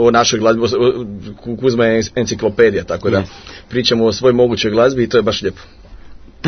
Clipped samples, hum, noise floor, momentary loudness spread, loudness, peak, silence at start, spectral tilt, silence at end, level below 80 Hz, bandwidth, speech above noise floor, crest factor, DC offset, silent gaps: under 0.1%; none; -35 dBFS; 12 LU; -15 LUFS; 0 dBFS; 0 s; -4.5 dB/octave; 0 s; -42 dBFS; 6.6 kHz; 21 dB; 14 dB; under 0.1%; none